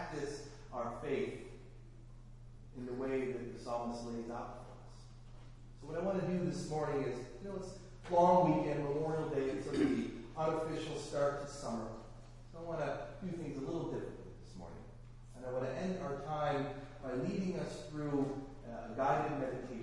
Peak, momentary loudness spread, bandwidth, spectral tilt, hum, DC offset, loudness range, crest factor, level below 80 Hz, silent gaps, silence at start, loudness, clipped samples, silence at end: -16 dBFS; 21 LU; 11.5 kHz; -7 dB/octave; none; under 0.1%; 9 LU; 22 dB; -56 dBFS; none; 0 s; -38 LUFS; under 0.1%; 0 s